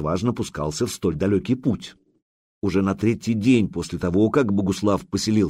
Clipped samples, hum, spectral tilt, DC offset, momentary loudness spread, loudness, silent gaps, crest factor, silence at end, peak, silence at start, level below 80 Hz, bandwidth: under 0.1%; none; -6.5 dB/octave; under 0.1%; 8 LU; -22 LUFS; 2.22-2.61 s; 16 dB; 0 s; -6 dBFS; 0 s; -46 dBFS; 15.5 kHz